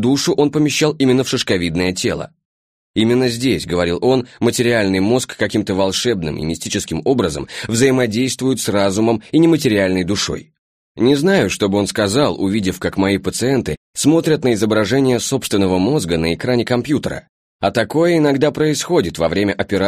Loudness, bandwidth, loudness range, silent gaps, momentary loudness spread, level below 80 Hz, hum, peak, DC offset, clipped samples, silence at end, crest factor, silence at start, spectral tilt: -16 LUFS; 15.5 kHz; 2 LU; 2.45-2.94 s, 10.58-10.95 s, 13.77-13.94 s, 17.29-17.59 s; 6 LU; -44 dBFS; none; -2 dBFS; under 0.1%; under 0.1%; 0 s; 14 dB; 0 s; -5 dB/octave